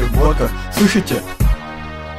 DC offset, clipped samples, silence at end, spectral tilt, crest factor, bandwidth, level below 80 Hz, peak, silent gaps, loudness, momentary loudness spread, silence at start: under 0.1%; under 0.1%; 0 s; -5.5 dB/octave; 16 dB; 16 kHz; -20 dBFS; 0 dBFS; none; -17 LUFS; 11 LU; 0 s